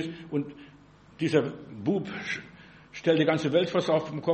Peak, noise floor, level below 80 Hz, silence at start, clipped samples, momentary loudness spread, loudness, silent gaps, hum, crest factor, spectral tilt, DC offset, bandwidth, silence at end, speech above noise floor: -10 dBFS; -54 dBFS; -66 dBFS; 0 s; under 0.1%; 11 LU; -28 LUFS; none; none; 18 dB; -6.5 dB/octave; under 0.1%; 8.4 kHz; 0 s; 27 dB